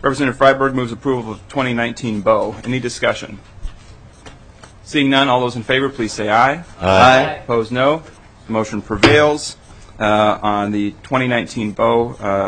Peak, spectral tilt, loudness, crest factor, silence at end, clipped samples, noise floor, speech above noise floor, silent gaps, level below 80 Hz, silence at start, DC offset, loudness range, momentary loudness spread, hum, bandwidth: 0 dBFS; -5 dB/octave; -16 LUFS; 16 dB; 0 s; under 0.1%; -41 dBFS; 25 dB; none; -40 dBFS; 0 s; under 0.1%; 6 LU; 12 LU; none; 9.6 kHz